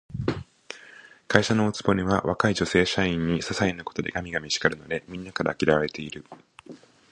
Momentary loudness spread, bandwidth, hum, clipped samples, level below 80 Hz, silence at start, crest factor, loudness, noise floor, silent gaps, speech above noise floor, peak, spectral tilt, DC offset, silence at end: 15 LU; 10.5 kHz; none; under 0.1%; -48 dBFS; 0.1 s; 26 dB; -25 LUFS; -50 dBFS; none; 25 dB; 0 dBFS; -5 dB/octave; under 0.1%; 0.35 s